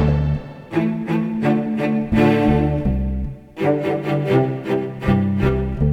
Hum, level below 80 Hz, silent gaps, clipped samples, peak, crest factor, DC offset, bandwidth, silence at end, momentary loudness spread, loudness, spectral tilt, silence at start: none; -30 dBFS; none; under 0.1%; -4 dBFS; 16 dB; 0.1%; 9.8 kHz; 0 s; 7 LU; -20 LUFS; -9 dB/octave; 0 s